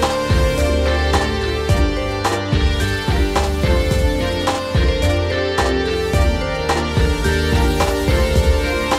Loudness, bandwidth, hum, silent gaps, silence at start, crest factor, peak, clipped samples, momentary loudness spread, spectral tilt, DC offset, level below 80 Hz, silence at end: -18 LUFS; 15.5 kHz; none; none; 0 s; 14 dB; -2 dBFS; under 0.1%; 3 LU; -5.5 dB/octave; under 0.1%; -20 dBFS; 0 s